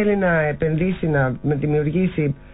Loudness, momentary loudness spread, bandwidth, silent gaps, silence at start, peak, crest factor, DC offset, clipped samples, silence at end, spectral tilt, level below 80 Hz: -20 LUFS; 3 LU; 4 kHz; none; 0 s; -8 dBFS; 12 dB; under 0.1%; under 0.1%; 0.05 s; -13 dB/octave; -40 dBFS